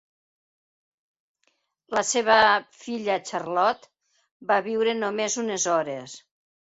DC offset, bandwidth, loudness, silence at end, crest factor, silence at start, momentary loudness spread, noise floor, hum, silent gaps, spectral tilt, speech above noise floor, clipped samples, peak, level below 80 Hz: under 0.1%; 8.2 kHz; -24 LUFS; 0.45 s; 22 dB; 1.9 s; 18 LU; -72 dBFS; none; 4.31-4.40 s; -2 dB/octave; 48 dB; under 0.1%; -4 dBFS; -68 dBFS